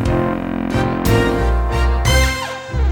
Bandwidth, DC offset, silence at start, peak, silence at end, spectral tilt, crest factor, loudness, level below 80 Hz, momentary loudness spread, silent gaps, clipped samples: 18.5 kHz; under 0.1%; 0 s; -2 dBFS; 0 s; -5.5 dB/octave; 14 dB; -17 LUFS; -20 dBFS; 6 LU; none; under 0.1%